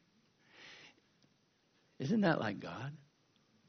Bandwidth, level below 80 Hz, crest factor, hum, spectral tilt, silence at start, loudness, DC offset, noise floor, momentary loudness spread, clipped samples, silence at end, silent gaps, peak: 6.6 kHz; -78 dBFS; 22 dB; none; -5.5 dB/octave; 0.6 s; -37 LUFS; under 0.1%; -74 dBFS; 25 LU; under 0.1%; 0.75 s; none; -18 dBFS